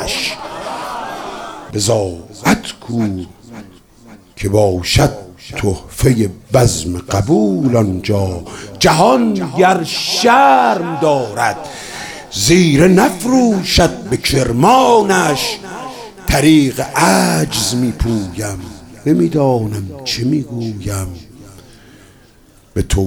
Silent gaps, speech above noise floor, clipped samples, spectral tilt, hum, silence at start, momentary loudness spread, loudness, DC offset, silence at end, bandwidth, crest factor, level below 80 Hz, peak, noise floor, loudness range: none; 33 dB; under 0.1%; -5 dB/octave; none; 0 s; 16 LU; -14 LUFS; under 0.1%; 0 s; 19.5 kHz; 14 dB; -32 dBFS; 0 dBFS; -46 dBFS; 7 LU